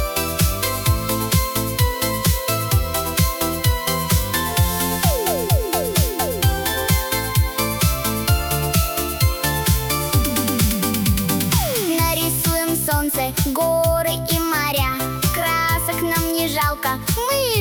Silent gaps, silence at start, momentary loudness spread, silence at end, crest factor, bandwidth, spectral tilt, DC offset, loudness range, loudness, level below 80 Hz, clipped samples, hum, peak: none; 0 s; 2 LU; 0 s; 16 dB; over 20 kHz; -4 dB/octave; under 0.1%; 1 LU; -19 LUFS; -28 dBFS; under 0.1%; none; -4 dBFS